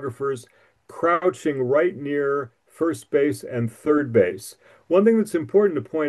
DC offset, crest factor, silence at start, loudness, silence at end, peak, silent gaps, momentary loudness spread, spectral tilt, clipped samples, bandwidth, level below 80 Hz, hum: under 0.1%; 16 dB; 0 s; -22 LUFS; 0 s; -6 dBFS; none; 9 LU; -7 dB/octave; under 0.1%; 12.5 kHz; -70 dBFS; none